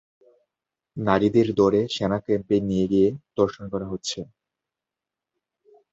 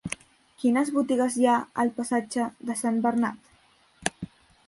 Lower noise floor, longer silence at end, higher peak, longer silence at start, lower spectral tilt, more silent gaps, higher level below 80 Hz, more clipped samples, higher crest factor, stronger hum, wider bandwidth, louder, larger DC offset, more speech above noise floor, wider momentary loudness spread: first, -88 dBFS vs -61 dBFS; first, 1.7 s vs 0.45 s; first, -4 dBFS vs -8 dBFS; first, 0.95 s vs 0.05 s; first, -6.5 dB/octave vs -4.5 dB/octave; neither; first, -52 dBFS vs -62 dBFS; neither; about the same, 20 dB vs 20 dB; neither; second, 8 kHz vs 11.5 kHz; first, -23 LUFS vs -26 LUFS; neither; first, 65 dB vs 36 dB; about the same, 12 LU vs 11 LU